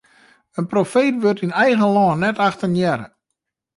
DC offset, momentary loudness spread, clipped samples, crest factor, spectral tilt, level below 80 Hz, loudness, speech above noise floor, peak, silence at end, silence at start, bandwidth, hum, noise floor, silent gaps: under 0.1%; 8 LU; under 0.1%; 14 dB; -6.5 dB/octave; -60 dBFS; -18 LUFS; 62 dB; -4 dBFS; 0.7 s; 0.55 s; 11.5 kHz; none; -79 dBFS; none